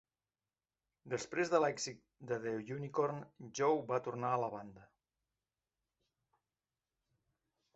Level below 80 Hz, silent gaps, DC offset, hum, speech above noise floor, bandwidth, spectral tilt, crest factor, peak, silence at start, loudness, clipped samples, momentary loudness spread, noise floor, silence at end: -78 dBFS; none; under 0.1%; none; over 52 dB; 8 kHz; -4.5 dB/octave; 24 dB; -16 dBFS; 1.05 s; -38 LUFS; under 0.1%; 15 LU; under -90 dBFS; 2.9 s